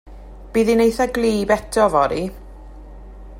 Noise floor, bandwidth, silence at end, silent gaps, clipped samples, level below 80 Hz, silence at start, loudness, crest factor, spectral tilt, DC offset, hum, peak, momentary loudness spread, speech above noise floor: -38 dBFS; 16.5 kHz; 0 s; none; under 0.1%; -38 dBFS; 0.05 s; -18 LUFS; 18 dB; -5 dB/octave; under 0.1%; none; -2 dBFS; 8 LU; 20 dB